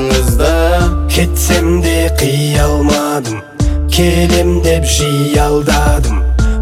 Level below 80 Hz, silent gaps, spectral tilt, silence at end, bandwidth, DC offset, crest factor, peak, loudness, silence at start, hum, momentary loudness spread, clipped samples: -14 dBFS; none; -5 dB/octave; 0 s; 16 kHz; under 0.1%; 10 dB; 0 dBFS; -12 LUFS; 0 s; none; 3 LU; under 0.1%